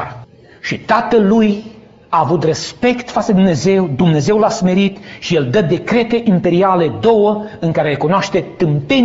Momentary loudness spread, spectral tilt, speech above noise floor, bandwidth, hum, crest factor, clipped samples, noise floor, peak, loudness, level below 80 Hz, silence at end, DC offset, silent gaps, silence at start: 6 LU; -5.5 dB/octave; 24 dB; 8 kHz; none; 14 dB; under 0.1%; -37 dBFS; 0 dBFS; -14 LUFS; -46 dBFS; 0 s; under 0.1%; none; 0 s